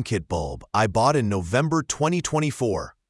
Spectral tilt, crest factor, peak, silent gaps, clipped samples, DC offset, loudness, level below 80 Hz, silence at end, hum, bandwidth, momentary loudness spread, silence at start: -5.5 dB/octave; 18 dB; -4 dBFS; none; under 0.1%; under 0.1%; -23 LUFS; -46 dBFS; 0.2 s; none; 12 kHz; 6 LU; 0 s